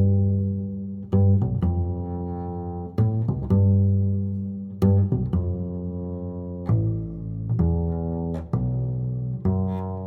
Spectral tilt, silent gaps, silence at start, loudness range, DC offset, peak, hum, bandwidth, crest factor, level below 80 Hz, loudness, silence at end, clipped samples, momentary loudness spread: -12 dB/octave; none; 0 s; 3 LU; under 0.1%; -8 dBFS; none; 2.1 kHz; 16 dB; -38 dBFS; -25 LUFS; 0 s; under 0.1%; 11 LU